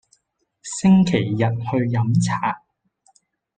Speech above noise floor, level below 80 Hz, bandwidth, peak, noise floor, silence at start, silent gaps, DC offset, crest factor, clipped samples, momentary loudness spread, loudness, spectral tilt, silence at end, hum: 52 dB; -54 dBFS; 9.4 kHz; -6 dBFS; -70 dBFS; 0.65 s; none; under 0.1%; 16 dB; under 0.1%; 14 LU; -20 LUFS; -6.5 dB/octave; 1 s; none